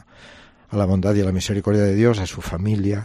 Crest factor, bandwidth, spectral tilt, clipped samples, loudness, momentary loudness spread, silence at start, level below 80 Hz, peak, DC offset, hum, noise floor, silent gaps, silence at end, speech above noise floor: 16 dB; 13 kHz; -7 dB/octave; under 0.1%; -20 LUFS; 8 LU; 0.2 s; -42 dBFS; -4 dBFS; under 0.1%; none; -46 dBFS; none; 0 s; 27 dB